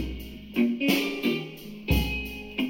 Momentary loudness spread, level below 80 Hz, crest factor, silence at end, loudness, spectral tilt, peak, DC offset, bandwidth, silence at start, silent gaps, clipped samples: 13 LU; -38 dBFS; 18 dB; 0 s; -27 LUFS; -5.5 dB/octave; -10 dBFS; under 0.1%; 17 kHz; 0 s; none; under 0.1%